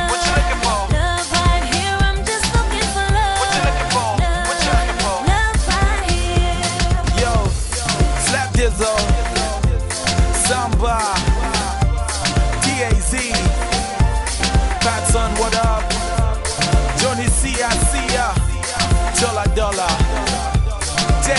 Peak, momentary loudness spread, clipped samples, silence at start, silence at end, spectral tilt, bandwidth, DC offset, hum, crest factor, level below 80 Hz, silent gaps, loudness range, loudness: -4 dBFS; 3 LU; under 0.1%; 0 s; 0 s; -3.5 dB/octave; 12 kHz; under 0.1%; none; 14 dB; -20 dBFS; none; 1 LU; -18 LUFS